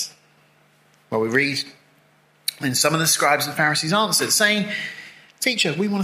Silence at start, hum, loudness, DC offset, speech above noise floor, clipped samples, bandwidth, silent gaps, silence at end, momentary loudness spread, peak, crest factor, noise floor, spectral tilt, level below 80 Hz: 0 s; 50 Hz at -50 dBFS; -20 LUFS; under 0.1%; 37 dB; under 0.1%; 16 kHz; none; 0 s; 12 LU; -2 dBFS; 20 dB; -58 dBFS; -2.5 dB/octave; -68 dBFS